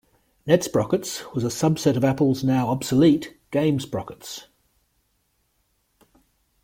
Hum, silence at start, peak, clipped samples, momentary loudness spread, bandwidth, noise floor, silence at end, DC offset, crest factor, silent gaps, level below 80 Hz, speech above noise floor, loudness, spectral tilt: none; 0.45 s; -4 dBFS; under 0.1%; 16 LU; 16.5 kHz; -69 dBFS; 2.2 s; under 0.1%; 20 dB; none; -56 dBFS; 48 dB; -22 LUFS; -6 dB/octave